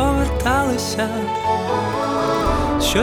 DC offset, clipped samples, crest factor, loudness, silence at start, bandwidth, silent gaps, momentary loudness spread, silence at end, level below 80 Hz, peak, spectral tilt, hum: under 0.1%; under 0.1%; 16 dB; -20 LUFS; 0 s; 19 kHz; none; 3 LU; 0 s; -28 dBFS; -4 dBFS; -4.5 dB/octave; none